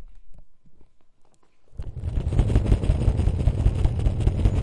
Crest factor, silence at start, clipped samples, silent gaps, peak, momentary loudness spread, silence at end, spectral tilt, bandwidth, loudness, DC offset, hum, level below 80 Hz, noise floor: 18 dB; 0 s; under 0.1%; none; -6 dBFS; 10 LU; 0 s; -8.5 dB/octave; 10.5 kHz; -24 LUFS; under 0.1%; none; -26 dBFS; -51 dBFS